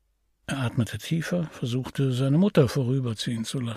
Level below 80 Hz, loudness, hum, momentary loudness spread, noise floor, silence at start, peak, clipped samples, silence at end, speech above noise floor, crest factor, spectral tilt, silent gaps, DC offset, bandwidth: -56 dBFS; -26 LUFS; none; 9 LU; -45 dBFS; 0.5 s; -8 dBFS; under 0.1%; 0 s; 20 dB; 18 dB; -6.5 dB/octave; none; under 0.1%; 15 kHz